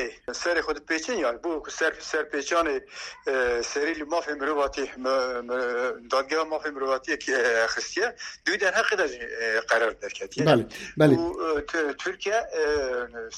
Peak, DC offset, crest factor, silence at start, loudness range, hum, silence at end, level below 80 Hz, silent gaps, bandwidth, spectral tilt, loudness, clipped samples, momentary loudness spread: -6 dBFS; under 0.1%; 20 dB; 0 s; 3 LU; none; 0 s; -54 dBFS; none; 13 kHz; -4 dB/octave; -26 LUFS; under 0.1%; 8 LU